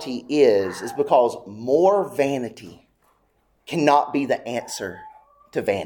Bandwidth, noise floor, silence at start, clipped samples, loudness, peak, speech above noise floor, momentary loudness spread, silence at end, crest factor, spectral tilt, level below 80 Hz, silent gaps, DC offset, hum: 19 kHz; -65 dBFS; 0 s; under 0.1%; -21 LUFS; -2 dBFS; 44 dB; 13 LU; 0 s; 20 dB; -5 dB/octave; -64 dBFS; none; under 0.1%; none